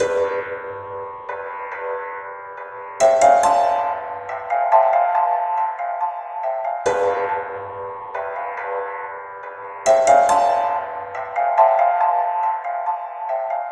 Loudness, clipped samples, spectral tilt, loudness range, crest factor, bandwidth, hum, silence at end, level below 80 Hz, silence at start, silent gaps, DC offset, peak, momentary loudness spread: -20 LUFS; under 0.1%; -2.5 dB/octave; 7 LU; 18 dB; 12 kHz; none; 0 s; -62 dBFS; 0 s; none; under 0.1%; -2 dBFS; 16 LU